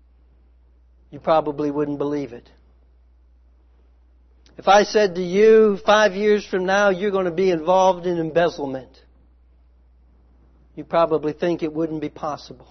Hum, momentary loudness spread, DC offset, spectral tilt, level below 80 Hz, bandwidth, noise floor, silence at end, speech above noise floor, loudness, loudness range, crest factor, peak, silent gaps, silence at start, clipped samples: none; 14 LU; under 0.1%; -5 dB/octave; -52 dBFS; 6.4 kHz; -53 dBFS; 0.15 s; 34 dB; -19 LUFS; 9 LU; 18 dB; -4 dBFS; none; 1.1 s; under 0.1%